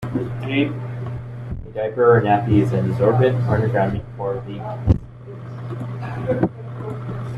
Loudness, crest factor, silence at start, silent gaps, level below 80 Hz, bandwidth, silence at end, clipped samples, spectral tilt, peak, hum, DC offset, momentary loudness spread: -21 LUFS; 18 dB; 0 s; none; -38 dBFS; 5.4 kHz; 0 s; under 0.1%; -9 dB/octave; -2 dBFS; none; under 0.1%; 15 LU